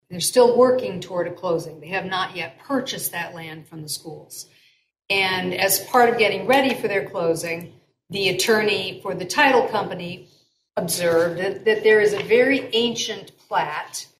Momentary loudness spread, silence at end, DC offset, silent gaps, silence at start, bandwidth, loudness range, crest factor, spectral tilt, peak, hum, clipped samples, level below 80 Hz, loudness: 15 LU; 0.15 s; under 0.1%; none; 0.1 s; 16 kHz; 7 LU; 18 dB; -3 dB/octave; -4 dBFS; none; under 0.1%; -64 dBFS; -21 LUFS